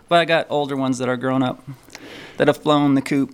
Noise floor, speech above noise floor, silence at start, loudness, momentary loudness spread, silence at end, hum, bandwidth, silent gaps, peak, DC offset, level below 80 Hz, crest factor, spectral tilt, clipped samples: -39 dBFS; 20 dB; 0.1 s; -19 LUFS; 20 LU; 0 s; none; 15 kHz; none; -2 dBFS; under 0.1%; -60 dBFS; 18 dB; -6 dB/octave; under 0.1%